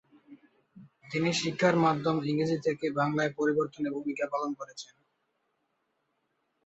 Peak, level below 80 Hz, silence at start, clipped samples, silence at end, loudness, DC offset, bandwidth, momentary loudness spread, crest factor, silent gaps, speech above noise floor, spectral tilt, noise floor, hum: -12 dBFS; -72 dBFS; 0.3 s; under 0.1%; 1.8 s; -29 LUFS; under 0.1%; 8.2 kHz; 10 LU; 20 dB; none; 49 dB; -5.5 dB/octave; -78 dBFS; none